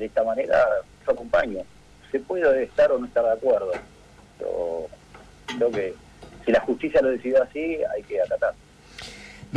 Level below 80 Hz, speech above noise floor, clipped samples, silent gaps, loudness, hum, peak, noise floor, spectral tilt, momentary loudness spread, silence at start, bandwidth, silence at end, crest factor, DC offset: -52 dBFS; 26 dB; under 0.1%; none; -24 LUFS; none; -12 dBFS; -49 dBFS; -5.5 dB/octave; 18 LU; 0 s; 10.5 kHz; 0 s; 14 dB; under 0.1%